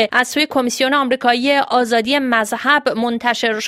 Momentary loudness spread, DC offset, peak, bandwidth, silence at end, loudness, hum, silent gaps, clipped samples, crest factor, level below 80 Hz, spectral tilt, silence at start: 2 LU; under 0.1%; 0 dBFS; 16 kHz; 0 s; -16 LUFS; none; none; under 0.1%; 16 dB; -60 dBFS; -2.5 dB/octave; 0 s